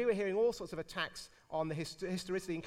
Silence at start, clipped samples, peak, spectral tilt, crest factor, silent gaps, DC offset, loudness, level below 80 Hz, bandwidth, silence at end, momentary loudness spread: 0 s; under 0.1%; -22 dBFS; -5 dB/octave; 16 dB; none; under 0.1%; -38 LUFS; -64 dBFS; 15.5 kHz; 0 s; 9 LU